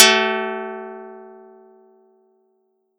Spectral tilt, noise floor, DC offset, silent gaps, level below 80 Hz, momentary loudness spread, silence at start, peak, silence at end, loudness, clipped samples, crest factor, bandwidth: 0 dB/octave; -67 dBFS; under 0.1%; none; -88 dBFS; 26 LU; 0 s; 0 dBFS; 1.7 s; -19 LUFS; under 0.1%; 22 dB; 18 kHz